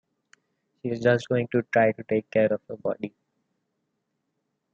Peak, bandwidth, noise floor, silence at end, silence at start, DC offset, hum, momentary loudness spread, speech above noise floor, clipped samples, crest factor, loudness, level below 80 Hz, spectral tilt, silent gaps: -8 dBFS; 8.2 kHz; -78 dBFS; 1.65 s; 0.85 s; under 0.1%; none; 11 LU; 54 dB; under 0.1%; 20 dB; -25 LUFS; -72 dBFS; -7.5 dB/octave; none